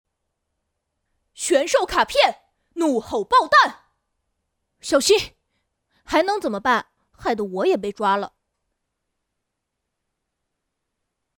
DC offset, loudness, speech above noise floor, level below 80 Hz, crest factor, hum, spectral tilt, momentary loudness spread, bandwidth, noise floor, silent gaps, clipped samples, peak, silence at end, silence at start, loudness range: under 0.1%; -20 LUFS; 60 dB; -54 dBFS; 20 dB; none; -2.5 dB/octave; 11 LU; over 20 kHz; -80 dBFS; none; under 0.1%; -4 dBFS; 3.1 s; 1.4 s; 7 LU